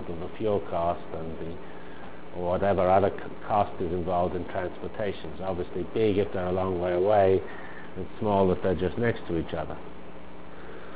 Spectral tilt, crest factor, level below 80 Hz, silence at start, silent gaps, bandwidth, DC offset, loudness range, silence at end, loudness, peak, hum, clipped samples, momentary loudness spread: -11 dB/octave; 20 dB; -46 dBFS; 0 s; none; 4 kHz; 2%; 3 LU; 0 s; -28 LUFS; -8 dBFS; none; under 0.1%; 20 LU